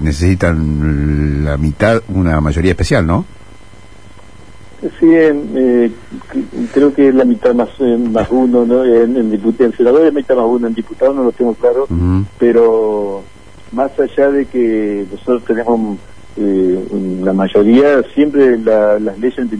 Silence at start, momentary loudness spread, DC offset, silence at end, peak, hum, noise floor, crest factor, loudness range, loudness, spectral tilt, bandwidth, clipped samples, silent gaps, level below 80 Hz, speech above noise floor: 0 s; 9 LU; 2%; 0 s; 0 dBFS; none; -39 dBFS; 12 dB; 4 LU; -13 LUFS; -8 dB/octave; 10.5 kHz; under 0.1%; none; -28 dBFS; 27 dB